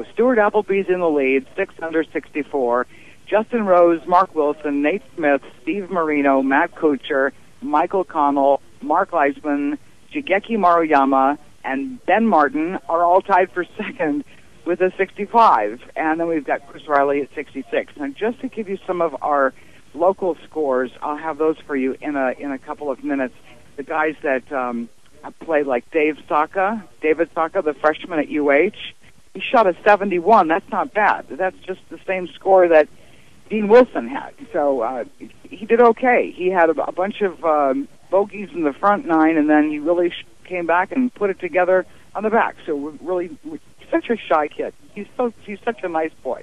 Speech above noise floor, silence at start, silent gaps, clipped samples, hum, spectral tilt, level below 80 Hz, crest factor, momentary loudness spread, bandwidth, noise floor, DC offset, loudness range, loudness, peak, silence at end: 31 dB; 0 s; none; under 0.1%; none; -6.5 dB/octave; -58 dBFS; 18 dB; 13 LU; 12 kHz; -50 dBFS; 0.6%; 5 LU; -19 LUFS; -2 dBFS; 0.05 s